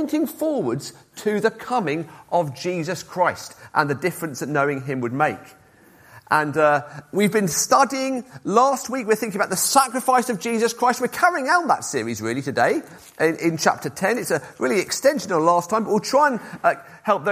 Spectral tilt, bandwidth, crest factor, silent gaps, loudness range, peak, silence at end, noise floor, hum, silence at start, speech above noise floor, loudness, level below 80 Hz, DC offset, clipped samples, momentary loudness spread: -4 dB/octave; 15.5 kHz; 20 dB; none; 4 LU; -2 dBFS; 0 s; -51 dBFS; none; 0 s; 30 dB; -21 LUFS; -64 dBFS; under 0.1%; under 0.1%; 9 LU